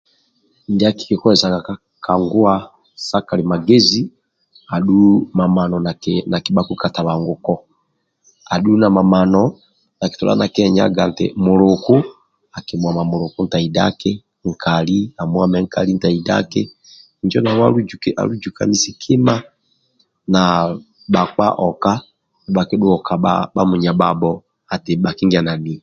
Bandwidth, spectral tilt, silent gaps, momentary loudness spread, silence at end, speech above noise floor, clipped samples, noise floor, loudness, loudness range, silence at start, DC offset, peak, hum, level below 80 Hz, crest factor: 7.6 kHz; -6 dB/octave; none; 10 LU; 0.05 s; 52 dB; under 0.1%; -67 dBFS; -16 LUFS; 3 LU; 0.7 s; under 0.1%; 0 dBFS; none; -46 dBFS; 16 dB